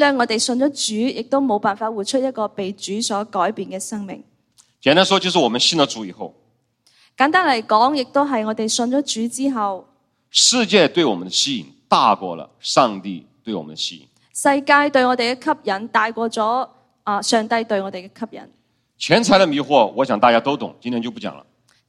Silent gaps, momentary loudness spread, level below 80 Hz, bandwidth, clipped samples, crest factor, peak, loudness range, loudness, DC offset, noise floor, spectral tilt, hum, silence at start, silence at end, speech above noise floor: none; 16 LU; -64 dBFS; 14 kHz; under 0.1%; 20 dB; 0 dBFS; 4 LU; -18 LUFS; under 0.1%; -61 dBFS; -3 dB/octave; none; 0 s; 0.5 s; 43 dB